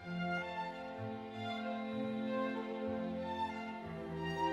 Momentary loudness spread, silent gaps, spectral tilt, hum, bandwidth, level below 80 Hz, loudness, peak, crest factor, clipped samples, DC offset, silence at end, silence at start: 6 LU; none; -7 dB/octave; none; 11.5 kHz; -70 dBFS; -41 LUFS; -24 dBFS; 16 dB; under 0.1%; under 0.1%; 0 s; 0 s